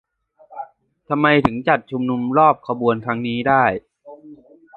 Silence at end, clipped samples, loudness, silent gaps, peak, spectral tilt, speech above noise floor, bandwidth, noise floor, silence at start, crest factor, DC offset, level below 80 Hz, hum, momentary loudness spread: 0.4 s; under 0.1%; -18 LUFS; none; 0 dBFS; -8.5 dB/octave; 33 dB; 4.7 kHz; -50 dBFS; 0.5 s; 20 dB; under 0.1%; -52 dBFS; none; 21 LU